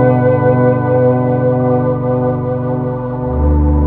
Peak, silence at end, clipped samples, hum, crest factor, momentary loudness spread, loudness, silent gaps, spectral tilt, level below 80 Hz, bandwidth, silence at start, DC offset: 0 dBFS; 0 s; under 0.1%; 50 Hz at -35 dBFS; 12 dB; 7 LU; -14 LUFS; none; -13 dB/octave; -22 dBFS; 3.7 kHz; 0 s; under 0.1%